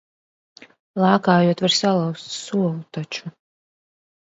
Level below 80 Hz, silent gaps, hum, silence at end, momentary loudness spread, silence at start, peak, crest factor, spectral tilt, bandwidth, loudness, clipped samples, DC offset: -66 dBFS; none; none; 1 s; 15 LU; 0.95 s; -2 dBFS; 20 dB; -5 dB/octave; 8 kHz; -20 LUFS; under 0.1%; under 0.1%